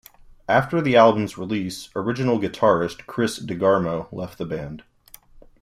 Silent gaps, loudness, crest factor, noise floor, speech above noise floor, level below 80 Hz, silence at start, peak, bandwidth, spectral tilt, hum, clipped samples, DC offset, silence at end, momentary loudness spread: none; -22 LUFS; 20 dB; -49 dBFS; 27 dB; -54 dBFS; 0.5 s; -2 dBFS; 15 kHz; -6 dB/octave; none; under 0.1%; under 0.1%; 0.8 s; 15 LU